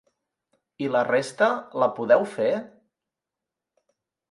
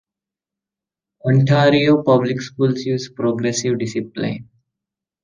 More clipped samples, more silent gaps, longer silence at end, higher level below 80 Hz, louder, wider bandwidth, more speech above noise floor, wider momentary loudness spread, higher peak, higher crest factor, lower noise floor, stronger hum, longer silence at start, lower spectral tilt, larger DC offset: neither; neither; first, 1.65 s vs 0.8 s; second, -76 dBFS vs -60 dBFS; second, -24 LUFS vs -18 LUFS; first, 11.5 kHz vs 9.8 kHz; second, 64 dB vs 71 dB; second, 6 LU vs 12 LU; second, -6 dBFS vs -2 dBFS; about the same, 20 dB vs 18 dB; about the same, -87 dBFS vs -88 dBFS; neither; second, 0.8 s vs 1.25 s; about the same, -5 dB/octave vs -6 dB/octave; neither